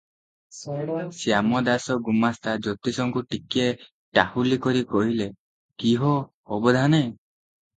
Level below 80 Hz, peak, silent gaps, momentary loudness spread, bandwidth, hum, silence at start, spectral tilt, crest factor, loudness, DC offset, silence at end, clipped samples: -58 dBFS; 0 dBFS; 3.92-4.12 s, 5.39-5.69 s, 6.34-6.43 s; 9 LU; 9.2 kHz; none; 0.55 s; -6 dB/octave; 24 dB; -24 LUFS; under 0.1%; 0.6 s; under 0.1%